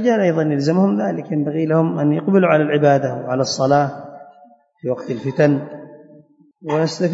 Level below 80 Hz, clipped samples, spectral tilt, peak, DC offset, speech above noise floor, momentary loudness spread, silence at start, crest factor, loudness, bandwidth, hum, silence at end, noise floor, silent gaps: -66 dBFS; under 0.1%; -6.5 dB/octave; -2 dBFS; under 0.1%; 33 dB; 12 LU; 0 s; 16 dB; -18 LUFS; 8 kHz; none; 0 s; -49 dBFS; none